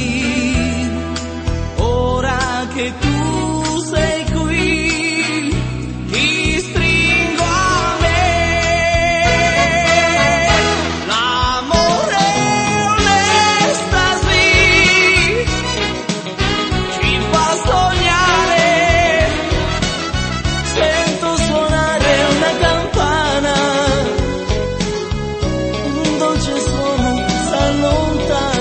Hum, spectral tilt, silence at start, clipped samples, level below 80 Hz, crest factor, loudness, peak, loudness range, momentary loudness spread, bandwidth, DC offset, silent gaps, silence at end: none; -4 dB/octave; 0 s; under 0.1%; -26 dBFS; 14 dB; -14 LUFS; 0 dBFS; 6 LU; 8 LU; 8.8 kHz; under 0.1%; none; 0 s